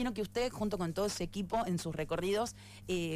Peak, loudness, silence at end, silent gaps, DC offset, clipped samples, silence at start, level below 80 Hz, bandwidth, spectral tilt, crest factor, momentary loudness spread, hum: -24 dBFS; -36 LUFS; 0 s; none; under 0.1%; under 0.1%; 0 s; -52 dBFS; 15.5 kHz; -5 dB/octave; 12 dB; 4 LU; none